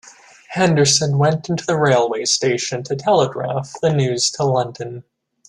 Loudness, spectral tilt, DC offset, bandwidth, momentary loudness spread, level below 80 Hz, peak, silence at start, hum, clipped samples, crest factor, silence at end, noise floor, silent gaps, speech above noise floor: -17 LUFS; -4 dB/octave; under 0.1%; 12 kHz; 11 LU; -56 dBFS; -2 dBFS; 0.5 s; none; under 0.1%; 16 dB; 0.5 s; -42 dBFS; none; 24 dB